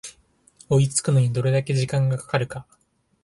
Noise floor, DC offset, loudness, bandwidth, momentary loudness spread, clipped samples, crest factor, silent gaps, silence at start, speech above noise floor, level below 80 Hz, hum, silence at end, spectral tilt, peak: -58 dBFS; under 0.1%; -22 LUFS; 11.5 kHz; 11 LU; under 0.1%; 18 dB; none; 0.05 s; 37 dB; -56 dBFS; none; 0.6 s; -5.5 dB/octave; -6 dBFS